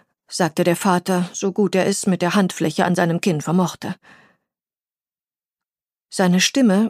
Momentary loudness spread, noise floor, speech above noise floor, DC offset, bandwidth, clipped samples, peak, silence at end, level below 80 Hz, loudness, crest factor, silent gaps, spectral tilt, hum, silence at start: 11 LU; under -90 dBFS; over 72 dB; under 0.1%; 15.5 kHz; under 0.1%; -4 dBFS; 0 s; -68 dBFS; -19 LUFS; 16 dB; none; -5 dB/octave; none; 0.3 s